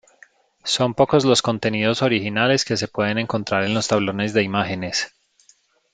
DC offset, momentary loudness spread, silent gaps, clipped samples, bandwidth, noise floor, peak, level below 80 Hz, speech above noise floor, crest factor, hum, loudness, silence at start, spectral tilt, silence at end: under 0.1%; 6 LU; none; under 0.1%; 9.6 kHz; -58 dBFS; -2 dBFS; -58 dBFS; 38 dB; 20 dB; none; -20 LUFS; 0.65 s; -4.5 dB/octave; 0.85 s